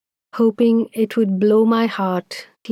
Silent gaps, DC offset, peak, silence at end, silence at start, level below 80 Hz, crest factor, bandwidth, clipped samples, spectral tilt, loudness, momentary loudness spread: none; under 0.1%; -6 dBFS; 0 s; 0.35 s; -74 dBFS; 12 dB; 13 kHz; under 0.1%; -7 dB/octave; -18 LUFS; 15 LU